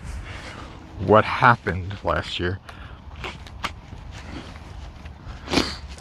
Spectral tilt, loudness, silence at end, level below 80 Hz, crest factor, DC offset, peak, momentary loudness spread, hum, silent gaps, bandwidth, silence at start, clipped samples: -5.5 dB/octave; -22 LUFS; 0 s; -40 dBFS; 24 dB; under 0.1%; 0 dBFS; 23 LU; none; none; 15 kHz; 0 s; under 0.1%